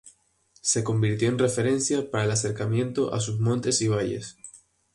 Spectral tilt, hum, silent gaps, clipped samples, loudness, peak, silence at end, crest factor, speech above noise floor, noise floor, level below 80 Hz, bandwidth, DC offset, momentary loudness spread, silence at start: -5 dB/octave; none; none; under 0.1%; -25 LUFS; -10 dBFS; 0.4 s; 16 dB; 38 dB; -63 dBFS; -58 dBFS; 11.5 kHz; under 0.1%; 7 LU; 0.05 s